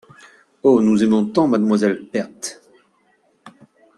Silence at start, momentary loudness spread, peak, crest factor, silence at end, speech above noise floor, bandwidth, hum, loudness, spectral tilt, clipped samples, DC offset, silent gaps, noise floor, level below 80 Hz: 0.65 s; 14 LU; -2 dBFS; 16 dB; 0.5 s; 44 dB; 12 kHz; none; -17 LUFS; -6 dB/octave; under 0.1%; under 0.1%; none; -61 dBFS; -62 dBFS